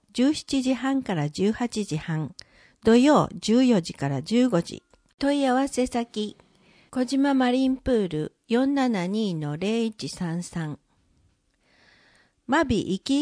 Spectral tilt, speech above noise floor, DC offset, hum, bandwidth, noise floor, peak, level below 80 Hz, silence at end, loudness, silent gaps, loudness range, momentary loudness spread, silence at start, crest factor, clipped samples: -5.5 dB/octave; 42 dB; under 0.1%; none; 10.5 kHz; -66 dBFS; -6 dBFS; -54 dBFS; 0 s; -24 LUFS; 5.14-5.18 s; 7 LU; 11 LU; 0.15 s; 18 dB; under 0.1%